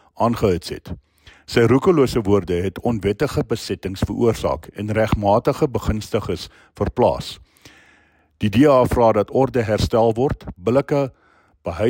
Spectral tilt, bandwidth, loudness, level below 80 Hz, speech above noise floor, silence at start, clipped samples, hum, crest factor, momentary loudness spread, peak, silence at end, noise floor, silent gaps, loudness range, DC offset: -7 dB/octave; 16.5 kHz; -19 LUFS; -38 dBFS; 38 dB; 0.2 s; under 0.1%; none; 16 dB; 13 LU; -4 dBFS; 0 s; -57 dBFS; none; 3 LU; under 0.1%